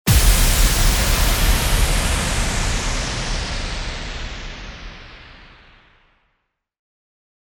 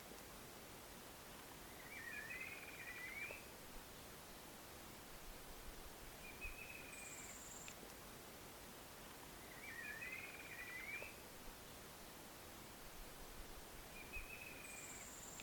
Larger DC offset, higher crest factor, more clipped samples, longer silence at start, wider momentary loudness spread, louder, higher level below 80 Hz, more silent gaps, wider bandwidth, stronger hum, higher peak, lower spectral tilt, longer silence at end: neither; about the same, 18 dB vs 20 dB; neither; about the same, 0.05 s vs 0 s; first, 19 LU vs 7 LU; first, -19 LUFS vs -53 LUFS; first, -22 dBFS vs -64 dBFS; neither; about the same, over 20 kHz vs 19 kHz; neither; first, -2 dBFS vs -34 dBFS; about the same, -3 dB/octave vs -2.5 dB/octave; first, 2.1 s vs 0 s